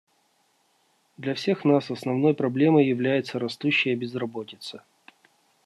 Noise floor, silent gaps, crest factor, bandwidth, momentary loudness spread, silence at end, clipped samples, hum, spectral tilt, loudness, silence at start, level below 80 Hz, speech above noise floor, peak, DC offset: -67 dBFS; none; 18 dB; 12 kHz; 16 LU; 0.85 s; under 0.1%; none; -7 dB/octave; -24 LUFS; 1.2 s; -72 dBFS; 43 dB; -8 dBFS; under 0.1%